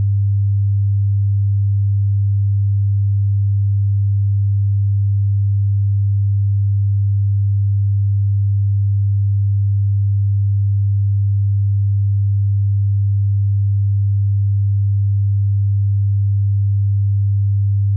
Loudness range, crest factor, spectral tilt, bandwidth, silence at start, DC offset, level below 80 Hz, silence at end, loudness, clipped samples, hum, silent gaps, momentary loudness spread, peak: 0 LU; 4 dB; -19 dB/octave; 0.2 kHz; 0 s; under 0.1%; -48 dBFS; 0 s; -17 LUFS; under 0.1%; none; none; 0 LU; -12 dBFS